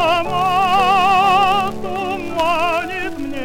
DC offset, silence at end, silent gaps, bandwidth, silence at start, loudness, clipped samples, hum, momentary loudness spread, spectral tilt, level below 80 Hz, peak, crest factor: under 0.1%; 0 s; none; 16.5 kHz; 0 s; -16 LUFS; under 0.1%; none; 11 LU; -4 dB/octave; -42 dBFS; -2 dBFS; 16 dB